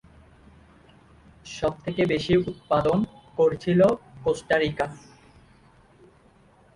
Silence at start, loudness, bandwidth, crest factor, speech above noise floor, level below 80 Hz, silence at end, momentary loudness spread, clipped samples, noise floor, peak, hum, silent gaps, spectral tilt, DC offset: 1.45 s; -24 LUFS; 11.5 kHz; 18 dB; 34 dB; -52 dBFS; 1.75 s; 9 LU; under 0.1%; -57 dBFS; -8 dBFS; none; none; -6.5 dB/octave; under 0.1%